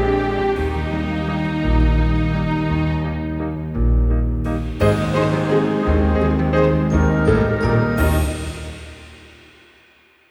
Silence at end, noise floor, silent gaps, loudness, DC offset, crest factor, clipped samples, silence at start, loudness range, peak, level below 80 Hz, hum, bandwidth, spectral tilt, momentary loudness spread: 1 s; -53 dBFS; none; -19 LUFS; under 0.1%; 16 dB; under 0.1%; 0 s; 3 LU; -2 dBFS; -24 dBFS; none; over 20 kHz; -7.5 dB/octave; 8 LU